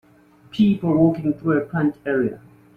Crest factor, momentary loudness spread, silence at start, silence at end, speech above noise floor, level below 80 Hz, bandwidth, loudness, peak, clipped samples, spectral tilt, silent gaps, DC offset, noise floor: 16 dB; 6 LU; 0.55 s; 0.4 s; 33 dB; -54 dBFS; 5.4 kHz; -20 LUFS; -4 dBFS; under 0.1%; -9.5 dB/octave; none; under 0.1%; -52 dBFS